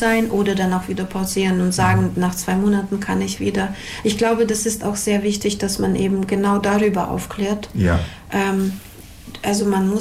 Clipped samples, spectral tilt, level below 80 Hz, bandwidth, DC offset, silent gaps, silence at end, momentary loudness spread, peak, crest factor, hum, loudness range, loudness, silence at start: under 0.1%; -5 dB/octave; -40 dBFS; 16 kHz; under 0.1%; none; 0 s; 7 LU; -8 dBFS; 12 dB; none; 2 LU; -20 LUFS; 0 s